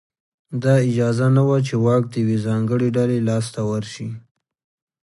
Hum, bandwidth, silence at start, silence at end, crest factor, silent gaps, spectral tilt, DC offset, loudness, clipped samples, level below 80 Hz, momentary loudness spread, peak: none; 11.5 kHz; 0.5 s; 0.85 s; 16 dB; none; -7.5 dB/octave; under 0.1%; -19 LUFS; under 0.1%; -58 dBFS; 13 LU; -4 dBFS